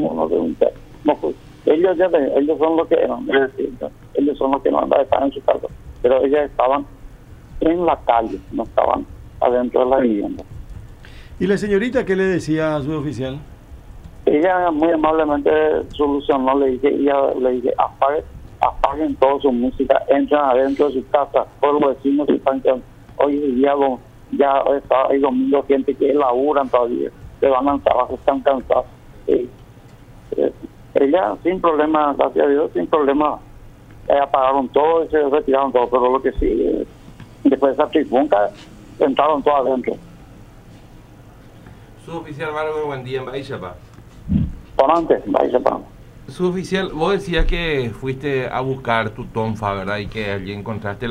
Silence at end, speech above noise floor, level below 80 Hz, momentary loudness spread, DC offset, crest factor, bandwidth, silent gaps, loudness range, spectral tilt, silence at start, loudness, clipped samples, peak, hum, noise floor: 0 s; 25 dB; -38 dBFS; 10 LU; under 0.1%; 18 dB; 10.5 kHz; none; 4 LU; -7 dB/octave; 0 s; -18 LUFS; under 0.1%; 0 dBFS; none; -42 dBFS